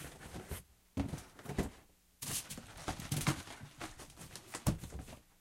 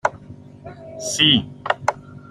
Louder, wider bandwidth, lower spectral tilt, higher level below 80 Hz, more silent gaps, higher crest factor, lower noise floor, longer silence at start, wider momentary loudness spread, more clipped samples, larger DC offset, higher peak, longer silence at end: second, -42 LUFS vs -19 LUFS; first, 16.5 kHz vs 14 kHz; about the same, -4 dB/octave vs -3 dB/octave; about the same, -54 dBFS vs -54 dBFS; neither; about the same, 26 dB vs 22 dB; first, -63 dBFS vs -41 dBFS; about the same, 0 s vs 0.05 s; second, 13 LU vs 25 LU; neither; neither; second, -16 dBFS vs -2 dBFS; about the same, 0.2 s vs 0.15 s